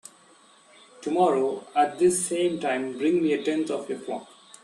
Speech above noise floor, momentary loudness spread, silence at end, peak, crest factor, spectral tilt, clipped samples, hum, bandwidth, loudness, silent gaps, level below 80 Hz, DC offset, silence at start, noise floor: 31 dB; 11 LU; 0.4 s; -10 dBFS; 16 dB; -4 dB/octave; under 0.1%; none; 12.5 kHz; -25 LUFS; none; -70 dBFS; under 0.1%; 1 s; -56 dBFS